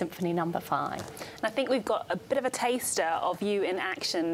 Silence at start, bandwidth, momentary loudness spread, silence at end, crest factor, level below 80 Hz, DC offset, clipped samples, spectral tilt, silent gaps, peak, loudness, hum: 0 s; 16.5 kHz; 4 LU; 0 s; 16 dB; -68 dBFS; under 0.1%; under 0.1%; -3.5 dB/octave; none; -14 dBFS; -30 LUFS; none